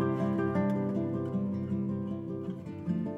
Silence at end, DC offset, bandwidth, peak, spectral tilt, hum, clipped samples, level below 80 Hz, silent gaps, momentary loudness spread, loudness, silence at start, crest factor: 0 s; under 0.1%; 5.6 kHz; -18 dBFS; -10 dB/octave; none; under 0.1%; -66 dBFS; none; 8 LU; -33 LUFS; 0 s; 14 dB